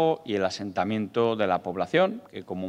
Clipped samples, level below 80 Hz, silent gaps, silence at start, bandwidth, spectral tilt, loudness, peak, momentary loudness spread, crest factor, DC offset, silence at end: under 0.1%; -72 dBFS; none; 0 s; 10 kHz; -6 dB/octave; -26 LUFS; -8 dBFS; 5 LU; 18 dB; under 0.1%; 0 s